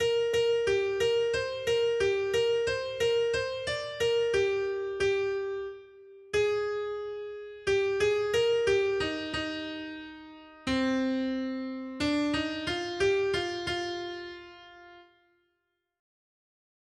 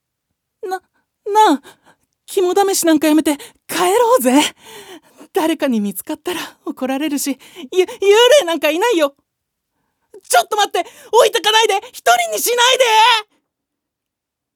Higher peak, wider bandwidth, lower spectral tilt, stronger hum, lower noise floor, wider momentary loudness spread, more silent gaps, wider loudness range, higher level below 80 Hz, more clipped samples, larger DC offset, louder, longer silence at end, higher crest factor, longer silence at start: second, -16 dBFS vs 0 dBFS; second, 12.5 kHz vs over 20 kHz; first, -4 dB/octave vs -2 dB/octave; neither; about the same, -80 dBFS vs -81 dBFS; about the same, 12 LU vs 14 LU; neither; about the same, 5 LU vs 4 LU; first, -58 dBFS vs -70 dBFS; neither; neither; second, -29 LUFS vs -15 LUFS; first, 1.95 s vs 1.35 s; about the same, 14 dB vs 16 dB; second, 0 s vs 0.65 s